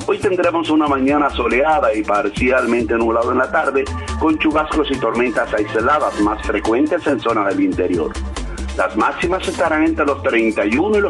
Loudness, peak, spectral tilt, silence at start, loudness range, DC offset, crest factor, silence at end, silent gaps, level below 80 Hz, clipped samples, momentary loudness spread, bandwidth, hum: -17 LUFS; -4 dBFS; -5.5 dB/octave; 0 s; 2 LU; under 0.1%; 12 dB; 0 s; none; -34 dBFS; under 0.1%; 4 LU; 11 kHz; none